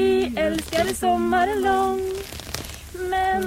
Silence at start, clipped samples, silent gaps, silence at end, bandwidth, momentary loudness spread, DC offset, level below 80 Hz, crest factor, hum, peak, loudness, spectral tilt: 0 s; under 0.1%; none; 0 s; 16.5 kHz; 11 LU; under 0.1%; -42 dBFS; 16 dB; none; -6 dBFS; -23 LUFS; -4.5 dB/octave